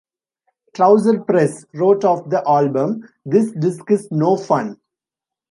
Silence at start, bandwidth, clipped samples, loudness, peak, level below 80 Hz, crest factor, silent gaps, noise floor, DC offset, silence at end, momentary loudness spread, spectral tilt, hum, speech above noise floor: 0.75 s; 11.5 kHz; under 0.1%; -17 LUFS; -2 dBFS; -68 dBFS; 16 dB; none; -87 dBFS; under 0.1%; 0.75 s; 8 LU; -7.5 dB/octave; none; 71 dB